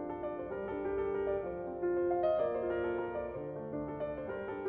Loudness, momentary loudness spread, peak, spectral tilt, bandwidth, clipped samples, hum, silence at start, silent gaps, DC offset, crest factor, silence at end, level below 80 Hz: -36 LUFS; 8 LU; -22 dBFS; -6.5 dB/octave; 4.5 kHz; under 0.1%; none; 0 s; none; under 0.1%; 14 dB; 0 s; -58 dBFS